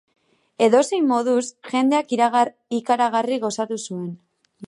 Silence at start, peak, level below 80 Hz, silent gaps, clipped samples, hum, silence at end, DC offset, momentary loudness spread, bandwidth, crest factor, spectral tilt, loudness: 0.6 s; -2 dBFS; -76 dBFS; none; under 0.1%; none; 0 s; under 0.1%; 10 LU; 11.5 kHz; 18 dB; -4.5 dB/octave; -21 LUFS